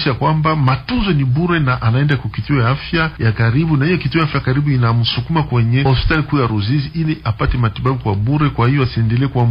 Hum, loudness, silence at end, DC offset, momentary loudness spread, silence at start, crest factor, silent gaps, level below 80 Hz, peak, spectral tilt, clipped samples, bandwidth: none; -16 LUFS; 0 s; under 0.1%; 4 LU; 0 s; 12 dB; none; -30 dBFS; -2 dBFS; -9.5 dB/octave; under 0.1%; 5.4 kHz